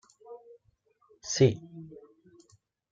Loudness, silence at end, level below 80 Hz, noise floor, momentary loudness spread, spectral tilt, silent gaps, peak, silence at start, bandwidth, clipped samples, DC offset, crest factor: -27 LUFS; 1.05 s; -68 dBFS; -69 dBFS; 25 LU; -5.5 dB/octave; none; -10 dBFS; 0.3 s; 7.6 kHz; under 0.1%; under 0.1%; 24 dB